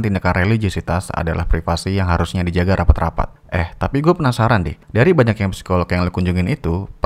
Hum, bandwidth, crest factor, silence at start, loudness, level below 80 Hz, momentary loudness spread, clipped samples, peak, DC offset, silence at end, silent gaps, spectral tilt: none; 13.5 kHz; 16 dB; 0 s; -18 LUFS; -26 dBFS; 7 LU; under 0.1%; 0 dBFS; under 0.1%; 0.15 s; none; -7 dB/octave